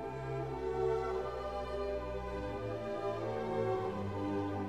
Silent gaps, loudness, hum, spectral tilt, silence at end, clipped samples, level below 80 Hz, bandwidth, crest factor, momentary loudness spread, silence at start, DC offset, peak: none; -38 LUFS; none; -7.5 dB/octave; 0 s; under 0.1%; -52 dBFS; 11 kHz; 14 dB; 5 LU; 0 s; 0.1%; -22 dBFS